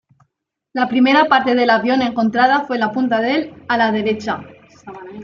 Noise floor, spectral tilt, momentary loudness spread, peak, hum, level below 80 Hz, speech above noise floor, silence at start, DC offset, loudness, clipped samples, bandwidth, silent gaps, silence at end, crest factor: -72 dBFS; -5.5 dB/octave; 12 LU; -2 dBFS; none; -62 dBFS; 56 dB; 0.75 s; under 0.1%; -16 LUFS; under 0.1%; 7.2 kHz; none; 0 s; 16 dB